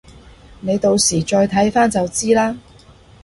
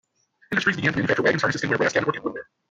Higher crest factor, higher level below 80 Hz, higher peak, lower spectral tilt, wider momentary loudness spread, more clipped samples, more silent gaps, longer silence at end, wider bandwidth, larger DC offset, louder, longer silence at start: about the same, 16 dB vs 18 dB; first, -44 dBFS vs -60 dBFS; first, -2 dBFS vs -6 dBFS; about the same, -4 dB/octave vs -5 dB/octave; about the same, 8 LU vs 10 LU; neither; neither; first, 0.65 s vs 0.25 s; first, 11.5 kHz vs 9.2 kHz; neither; first, -16 LUFS vs -23 LUFS; first, 0.65 s vs 0.5 s